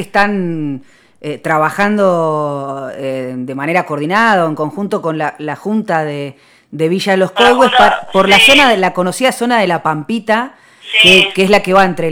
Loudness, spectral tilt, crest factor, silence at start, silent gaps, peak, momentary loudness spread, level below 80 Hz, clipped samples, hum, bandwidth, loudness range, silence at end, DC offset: -12 LUFS; -4 dB/octave; 12 dB; 0 s; none; 0 dBFS; 16 LU; -48 dBFS; 0.2%; none; over 20 kHz; 7 LU; 0 s; under 0.1%